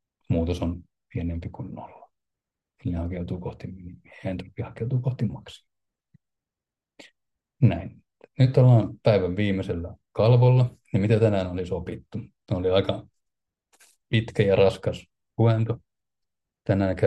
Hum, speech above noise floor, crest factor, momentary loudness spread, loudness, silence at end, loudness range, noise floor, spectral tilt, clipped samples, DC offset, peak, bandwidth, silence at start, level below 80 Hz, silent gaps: none; 66 dB; 18 dB; 19 LU; -24 LUFS; 0 s; 12 LU; -90 dBFS; -8.5 dB/octave; under 0.1%; under 0.1%; -6 dBFS; 8.6 kHz; 0.3 s; -52 dBFS; none